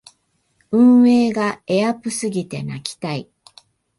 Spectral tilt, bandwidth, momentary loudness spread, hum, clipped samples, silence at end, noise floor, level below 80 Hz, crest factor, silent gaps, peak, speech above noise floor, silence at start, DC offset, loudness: -5.5 dB/octave; 11.5 kHz; 16 LU; none; under 0.1%; 0.75 s; -65 dBFS; -62 dBFS; 14 dB; none; -4 dBFS; 47 dB; 0.7 s; under 0.1%; -18 LUFS